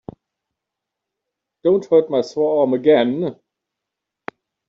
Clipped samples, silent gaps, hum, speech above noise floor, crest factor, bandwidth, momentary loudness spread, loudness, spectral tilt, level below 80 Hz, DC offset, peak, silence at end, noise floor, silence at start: under 0.1%; none; none; 66 dB; 18 dB; 7.2 kHz; 22 LU; -18 LUFS; -5.5 dB/octave; -64 dBFS; under 0.1%; -2 dBFS; 1.35 s; -83 dBFS; 1.65 s